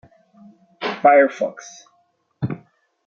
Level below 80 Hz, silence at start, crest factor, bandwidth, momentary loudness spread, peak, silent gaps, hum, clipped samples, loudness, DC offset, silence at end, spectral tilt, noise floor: -64 dBFS; 0.8 s; 20 dB; 7.2 kHz; 23 LU; -2 dBFS; none; none; under 0.1%; -19 LUFS; under 0.1%; 0.5 s; -6 dB/octave; -64 dBFS